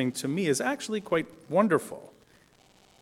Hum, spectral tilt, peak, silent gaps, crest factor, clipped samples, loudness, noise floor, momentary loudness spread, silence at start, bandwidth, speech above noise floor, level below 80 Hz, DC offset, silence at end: none; -5 dB/octave; -8 dBFS; none; 20 dB; under 0.1%; -28 LUFS; -60 dBFS; 9 LU; 0 s; 16.5 kHz; 32 dB; -70 dBFS; under 0.1%; 0.9 s